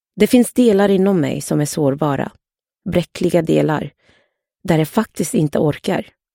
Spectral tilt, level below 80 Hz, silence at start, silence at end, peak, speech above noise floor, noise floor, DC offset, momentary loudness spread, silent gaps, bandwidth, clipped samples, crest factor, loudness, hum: -6 dB/octave; -48 dBFS; 0.15 s; 0.3 s; 0 dBFS; 47 dB; -63 dBFS; under 0.1%; 10 LU; none; 17 kHz; under 0.1%; 16 dB; -17 LUFS; none